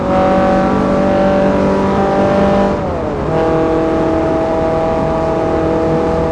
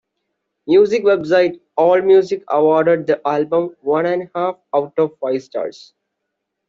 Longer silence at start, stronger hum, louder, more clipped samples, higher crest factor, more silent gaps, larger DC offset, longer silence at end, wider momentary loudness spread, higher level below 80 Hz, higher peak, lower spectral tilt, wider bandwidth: second, 0 s vs 0.65 s; neither; first, -13 LUFS vs -16 LUFS; neither; about the same, 12 dB vs 14 dB; neither; neither; second, 0 s vs 1 s; second, 3 LU vs 9 LU; first, -30 dBFS vs -64 dBFS; about the same, 0 dBFS vs -2 dBFS; first, -8 dB/octave vs -6.5 dB/octave; first, 10.5 kHz vs 7.4 kHz